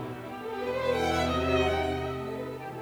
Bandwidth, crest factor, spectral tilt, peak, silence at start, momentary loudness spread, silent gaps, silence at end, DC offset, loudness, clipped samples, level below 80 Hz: over 20 kHz; 16 dB; -5.5 dB/octave; -14 dBFS; 0 s; 11 LU; none; 0 s; under 0.1%; -30 LUFS; under 0.1%; -46 dBFS